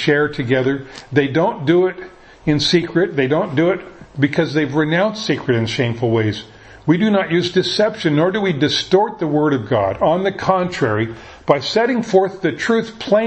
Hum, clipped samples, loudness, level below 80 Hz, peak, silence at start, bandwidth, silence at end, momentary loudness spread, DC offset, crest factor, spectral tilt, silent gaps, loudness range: none; under 0.1%; -17 LUFS; -50 dBFS; 0 dBFS; 0 s; 8.6 kHz; 0 s; 6 LU; under 0.1%; 16 dB; -6 dB/octave; none; 1 LU